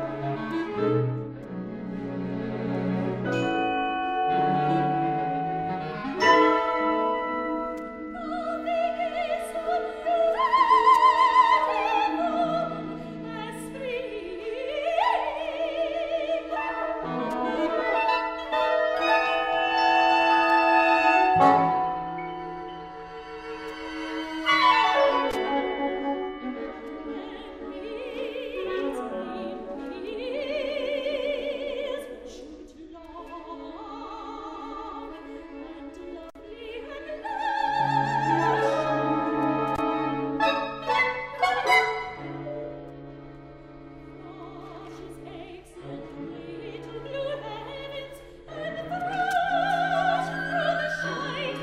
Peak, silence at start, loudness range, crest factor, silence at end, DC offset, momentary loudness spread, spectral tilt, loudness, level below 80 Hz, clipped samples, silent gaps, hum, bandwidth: -6 dBFS; 0 s; 17 LU; 20 dB; 0 s; under 0.1%; 21 LU; -5.5 dB/octave; -25 LUFS; -54 dBFS; under 0.1%; none; none; 15 kHz